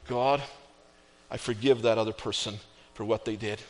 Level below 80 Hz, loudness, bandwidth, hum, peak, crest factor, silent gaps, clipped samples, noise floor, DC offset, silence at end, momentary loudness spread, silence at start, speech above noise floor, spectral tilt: -60 dBFS; -29 LUFS; 10.5 kHz; none; -12 dBFS; 18 dB; none; under 0.1%; -58 dBFS; under 0.1%; 0 s; 15 LU; 0 s; 30 dB; -4.5 dB/octave